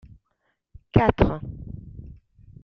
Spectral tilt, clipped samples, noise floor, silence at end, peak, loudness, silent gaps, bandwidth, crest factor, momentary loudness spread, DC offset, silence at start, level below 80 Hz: -9.5 dB/octave; under 0.1%; -74 dBFS; 0.5 s; -2 dBFS; -22 LUFS; none; 6.2 kHz; 24 dB; 22 LU; under 0.1%; 0.95 s; -38 dBFS